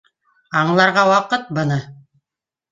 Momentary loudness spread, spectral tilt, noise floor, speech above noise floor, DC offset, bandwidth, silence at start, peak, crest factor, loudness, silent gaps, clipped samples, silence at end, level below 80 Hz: 9 LU; -5.5 dB/octave; -87 dBFS; 71 dB; under 0.1%; 9.4 kHz; 0.5 s; -2 dBFS; 18 dB; -17 LUFS; none; under 0.1%; 0.8 s; -60 dBFS